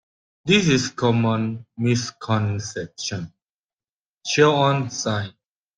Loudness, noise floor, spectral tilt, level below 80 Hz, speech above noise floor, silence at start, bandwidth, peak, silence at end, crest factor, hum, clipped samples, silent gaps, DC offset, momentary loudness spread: -21 LUFS; under -90 dBFS; -5 dB/octave; -58 dBFS; over 69 dB; 0.45 s; 10 kHz; -4 dBFS; 0.45 s; 20 dB; none; under 0.1%; 3.49-3.77 s, 3.89-4.02 s, 4.08-4.13 s; under 0.1%; 15 LU